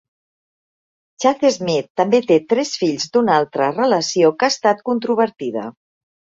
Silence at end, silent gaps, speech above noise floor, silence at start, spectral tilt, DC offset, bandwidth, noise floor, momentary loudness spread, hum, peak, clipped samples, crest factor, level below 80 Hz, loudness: 0.7 s; 1.90-1.95 s; over 73 dB; 1.2 s; -4.5 dB/octave; under 0.1%; 7.8 kHz; under -90 dBFS; 6 LU; none; -2 dBFS; under 0.1%; 16 dB; -64 dBFS; -17 LUFS